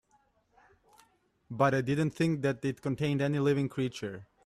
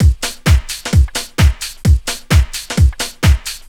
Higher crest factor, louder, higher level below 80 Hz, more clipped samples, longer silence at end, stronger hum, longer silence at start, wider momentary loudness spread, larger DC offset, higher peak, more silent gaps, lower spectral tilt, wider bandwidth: first, 20 dB vs 14 dB; second, -31 LUFS vs -15 LUFS; second, -66 dBFS vs -16 dBFS; neither; about the same, 0.2 s vs 0.1 s; neither; first, 1.5 s vs 0 s; first, 8 LU vs 3 LU; neither; second, -12 dBFS vs 0 dBFS; neither; first, -7 dB/octave vs -4.5 dB/octave; second, 13 kHz vs 17 kHz